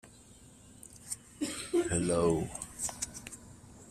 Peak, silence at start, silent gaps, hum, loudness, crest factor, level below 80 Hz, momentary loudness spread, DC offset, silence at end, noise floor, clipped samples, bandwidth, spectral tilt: -16 dBFS; 0.05 s; none; none; -34 LUFS; 20 dB; -56 dBFS; 25 LU; under 0.1%; 0 s; -56 dBFS; under 0.1%; 15 kHz; -4.5 dB/octave